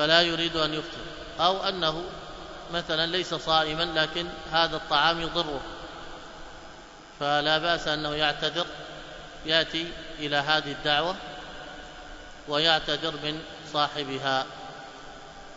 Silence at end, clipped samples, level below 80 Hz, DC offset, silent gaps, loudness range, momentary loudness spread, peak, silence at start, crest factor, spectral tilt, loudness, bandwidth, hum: 0 s; under 0.1%; -50 dBFS; under 0.1%; none; 2 LU; 19 LU; -4 dBFS; 0 s; 24 dB; -3.5 dB/octave; -26 LUFS; 8 kHz; none